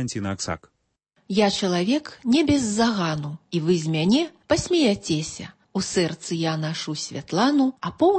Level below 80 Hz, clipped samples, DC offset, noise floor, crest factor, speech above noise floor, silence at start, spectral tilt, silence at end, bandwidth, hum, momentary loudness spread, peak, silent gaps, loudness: -52 dBFS; under 0.1%; under 0.1%; -69 dBFS; 16 dB; 46 dB; 0 s; -5 dB/octave; 0 s; 8.8 kHz; none; 9 LU; -6 dBFS; none; -23 LUFS